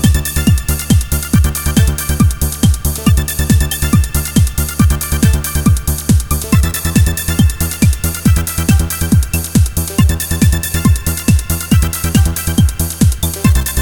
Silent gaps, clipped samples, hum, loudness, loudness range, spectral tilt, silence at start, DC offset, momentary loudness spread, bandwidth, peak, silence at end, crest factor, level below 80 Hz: none; under 0.1%; none; -13 LUFS; 0 LU; -5 dB/octave; 0 s; 0.4%; 1 LU; over 20 kHz; 0 dBFS; 0 s; 12 dB; -18 dBFS